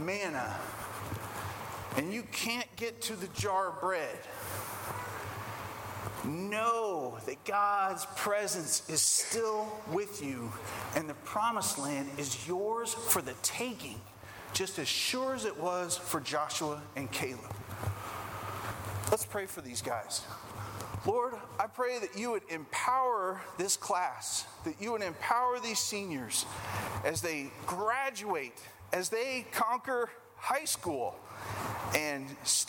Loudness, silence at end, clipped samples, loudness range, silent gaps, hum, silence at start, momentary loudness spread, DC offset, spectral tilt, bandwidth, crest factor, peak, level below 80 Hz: -34 LUFS; 0 s; under 0.1%; 5 LU; none; none; 0 s; 10 LU; under 0.1%; -2.5 dB/octave; 18 kHz; 24 dB; -10 dBFS; -64 dBFS